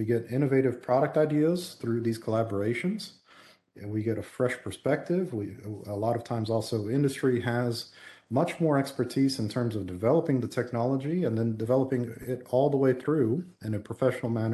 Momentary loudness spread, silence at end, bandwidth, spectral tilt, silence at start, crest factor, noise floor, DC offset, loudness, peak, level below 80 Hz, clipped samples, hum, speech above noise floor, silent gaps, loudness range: 9 LU; 0 s; 12.5 kHz; -7 dB/octave; 0 s; 16 dB; -57 dBFS; under 0.1%; -28 LUFS; -12 dBFS; -60 dBFS; under 0.1%; none; 29 dB; none; 4 LU